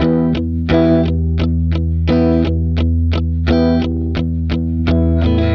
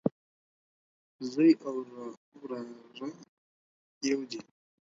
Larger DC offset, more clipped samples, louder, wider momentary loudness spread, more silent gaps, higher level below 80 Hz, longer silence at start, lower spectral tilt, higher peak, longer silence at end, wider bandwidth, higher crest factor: neither; neither; first, -15 LUFS vs -31 LUFS; second, 5 LU vs 20 LU; second, none vs 0.12-1.19 s, 2.17-2.32 s, 3.29-4.01 s; first, -22 dBFS vs -80 dBFS; about the same, 0 s vs 0.05 s; first, -9.5 dB/octave vs -5.5 dB/octave; first, 0 dBFS vs -12 dBFS; second, 0 s vs 0.45 s; second, 5.8 kHz vs 7.8 kHz; second, 14 dB vs 22 dB